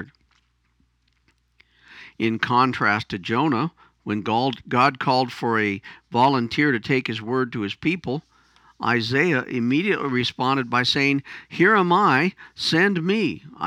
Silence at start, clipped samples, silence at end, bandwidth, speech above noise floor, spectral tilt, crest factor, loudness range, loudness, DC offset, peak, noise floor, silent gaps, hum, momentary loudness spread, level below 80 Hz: 0 s; under 0.1%; 0 s; 14 kHz; 44 dB; -5.5 dB/octave; 20 dB; 4 LU; -21 LUFS; under 0.1%; -4 dBFS; -66 dBFS; none; none; 9 LU; -62 dBFS